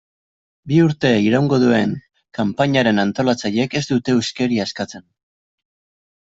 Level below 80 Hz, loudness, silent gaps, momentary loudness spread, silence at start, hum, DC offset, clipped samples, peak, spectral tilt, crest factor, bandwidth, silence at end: -56 dBFS; -18 LUFS; none; 9 LU; 0.65 s; none; under 0.1%; under 0.1%; -2 dBFS; -6 dB/octave; 16 dB; 8 kHz; 1.35 s